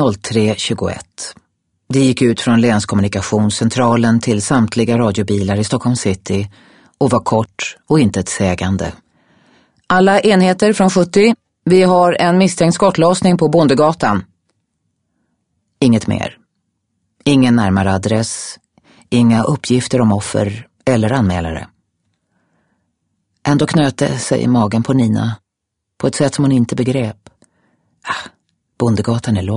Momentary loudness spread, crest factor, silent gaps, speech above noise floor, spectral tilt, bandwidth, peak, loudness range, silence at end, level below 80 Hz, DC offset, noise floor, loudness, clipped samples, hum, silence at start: 11 LU; 14 dB; none; 63 dB; -6 dB/octave; 11 kHz; 0 dBFS; 7 LU; 0 s; -46 dBFS; under 0.1%; -77 dBFS; -14 LUFS; under 0.1%; none; 0 s